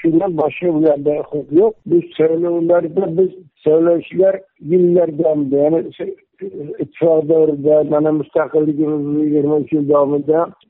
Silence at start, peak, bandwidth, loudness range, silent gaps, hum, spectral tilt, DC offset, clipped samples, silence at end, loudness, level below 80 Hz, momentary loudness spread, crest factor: 0 s; -4 dBFS; 3.9 kHz; 1 LU; none; none; -8.5 dB/octave; under 0.1%; under 0.1%; 0.2 s; -15 LUFS; -60 dBFS; 8 LU; 12 dB